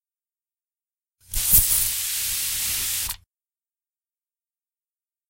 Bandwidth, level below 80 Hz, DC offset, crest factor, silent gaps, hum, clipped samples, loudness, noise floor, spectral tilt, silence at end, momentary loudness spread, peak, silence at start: 16 kHz; -40 dBFS; under 0.1%; 26 dB; none; none; under 0.1%; -20 LUFS; under -90 dBFS; 0.5 dB/octave; 2.15 s; 14 LU; -2 dBFS; 1.3 s